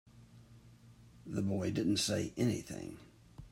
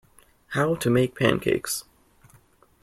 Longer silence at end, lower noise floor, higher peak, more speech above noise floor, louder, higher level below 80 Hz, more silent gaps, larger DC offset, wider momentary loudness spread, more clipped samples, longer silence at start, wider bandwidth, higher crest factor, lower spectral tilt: second, 0.05 s vs 1 s; about the same, -59 dBFS vs -58 dBFS; second, -22 dBFS vs -4 dBFS; second, 24 dB vs 35 dB; second, -36 LUFS vs -24 LUFS; second, -64 dBFS vs -54 dBFS; neither; neither; first, 23 LU vs 9 LU; neither; second, 0.15 s vs 0.5 s; about the same, 16 kHz vs 15.5 kHz; second, 16 dB vs 22 dB; about the same, -5 dB/octave vs -5 dB/octave